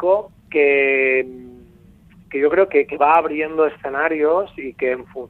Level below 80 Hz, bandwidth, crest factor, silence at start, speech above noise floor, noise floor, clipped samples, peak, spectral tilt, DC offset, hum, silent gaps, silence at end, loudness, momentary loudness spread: -56 dBFS; 4.2 kHz; 16 dB; 0 s; 30 dB; -48 dBFS; under 0.1%; -2 dBFS; -7 dB/octave; under 0.1%; none; none; 0.05 s; -18 LUFS; 8 LU